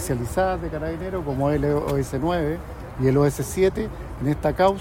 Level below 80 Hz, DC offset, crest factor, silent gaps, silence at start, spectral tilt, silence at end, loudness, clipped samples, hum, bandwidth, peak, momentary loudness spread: -36 dBFS; under 0.1%; 16 dB; none; 0 s; -6.5 dB/octave; 0 s; -24 LUFS; under 0.1%; none; 16.5 kHz; -6 dBFS; 9 LU